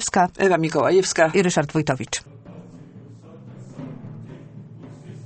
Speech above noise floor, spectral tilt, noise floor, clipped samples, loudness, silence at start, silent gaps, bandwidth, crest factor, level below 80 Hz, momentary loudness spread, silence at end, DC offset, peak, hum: 23 dB; -4.5 dB/octave; -43 dBFS; under 0.1%; -20 LUFS; 0 s; none; 8.8 kHz; 20 dB; -54 dBFS; 24 LU; 0 s; under 0.1%; -2 dBFS; none